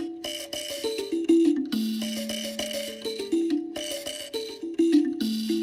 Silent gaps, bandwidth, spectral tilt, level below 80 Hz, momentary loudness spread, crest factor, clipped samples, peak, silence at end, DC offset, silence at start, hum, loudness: none; 16 kHz; -3.5 dB/octave; -66 dBFS; 11 LU; 16 dB; under 0.1%; -10 dBFS; 0 s; under 0.1%; 0 s; none; -27 LUFS